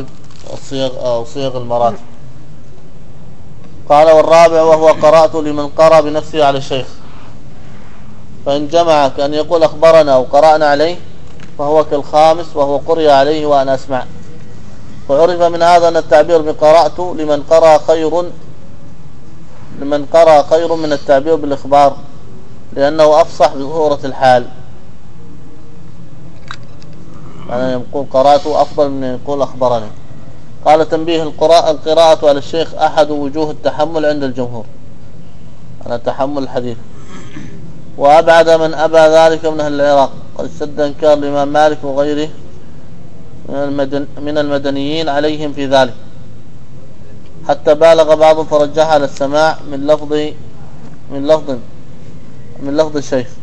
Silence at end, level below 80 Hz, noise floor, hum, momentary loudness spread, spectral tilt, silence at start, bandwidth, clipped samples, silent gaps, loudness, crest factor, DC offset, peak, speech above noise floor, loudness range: 0.15 s; -44 dBFS; -37 dBFS; none; 16 LU; -5 dB/octave; 0 s; 11 kHz; 1%; none; -11 LUFS; 14 dB; 10%; 0 dBFS; 26 dB; 9 LU